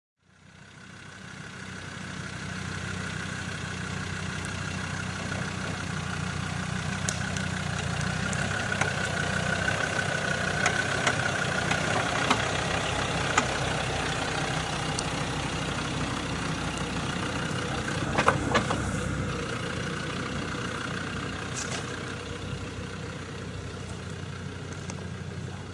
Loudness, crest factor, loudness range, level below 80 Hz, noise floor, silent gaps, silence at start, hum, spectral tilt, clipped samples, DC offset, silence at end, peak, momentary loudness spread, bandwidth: -30 LUFS; 26 dB; 9 LU; -46 dBFS; -53 dBFS; none; 0.45 s; none; -4 dB/octave; under 0.1%; under 0.1%; 0 s; -4 dBFS; 12 LU; 11.5 kHz